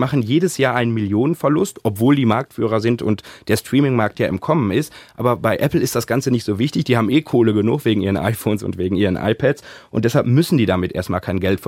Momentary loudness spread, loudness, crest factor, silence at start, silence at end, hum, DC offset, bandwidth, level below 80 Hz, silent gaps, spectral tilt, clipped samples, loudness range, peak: 6 LU; -18 LUFS; 16 dB; 0 s; 0 s; none; under 0.1%; 16.5 kHz; -48 dBFS; none; -6.5 dB/octave; under 0.1%; 1 LU; -2 dBFS